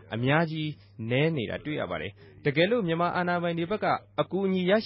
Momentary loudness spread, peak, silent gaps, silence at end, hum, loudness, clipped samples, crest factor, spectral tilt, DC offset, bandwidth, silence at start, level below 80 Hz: 9 LU; -10 dBFS; none; 0 s; none; -28 LUFS; under 0.1%; 18 dB; -10.5 dB/octave; under 0.1%; 5.8 kHz; 0.05 s; -60 dBFS